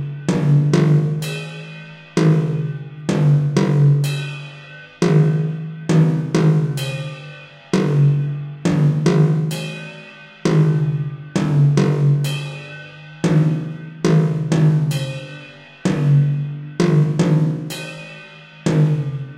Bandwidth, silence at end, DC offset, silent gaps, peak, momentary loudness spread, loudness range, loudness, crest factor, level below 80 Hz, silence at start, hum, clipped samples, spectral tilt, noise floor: 12 kHz; 0 s; under 0.1%; none; -2 dBFS; 19 LU; 1 LU; -18 LUFS; 16 dB; -54 dBFS; 0 s; none; under 0.1%; -7.5 dB/octave; -40 dBFS